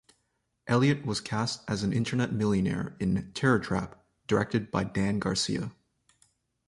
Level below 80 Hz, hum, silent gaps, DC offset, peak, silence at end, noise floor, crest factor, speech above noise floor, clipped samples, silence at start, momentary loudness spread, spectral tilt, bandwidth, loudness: -52 dBFS; none; none; under 0.1%; -10 dBFS; 0.95 s; -77 dBFS; 20 dB; 49 dB; under 0.1%; 0.65 s; 7 LU; -5.5 dB/octave; 11.5 kHz; -29 LUFS